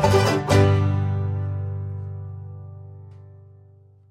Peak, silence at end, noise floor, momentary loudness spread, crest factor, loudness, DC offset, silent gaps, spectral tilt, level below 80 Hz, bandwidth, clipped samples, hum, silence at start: -6 dBFS; 0.75 s; -51 dBFS; 24 LU; 16 dB; -22 LUFS; under 0.1%; none; -6.5 dB/octave; -46 dBFS; 13.5 kHz; under 0.1%; none; 0 s